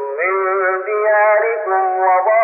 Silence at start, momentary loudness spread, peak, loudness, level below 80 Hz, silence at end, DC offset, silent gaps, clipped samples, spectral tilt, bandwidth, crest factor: 0 s; 5 LU; -4 dBFS; -15 LUFS; under -90 dBFS; 0 s; under 0.1%; none; under 0.1%; -2 dB/octave; 2.9 kHz; 10 dB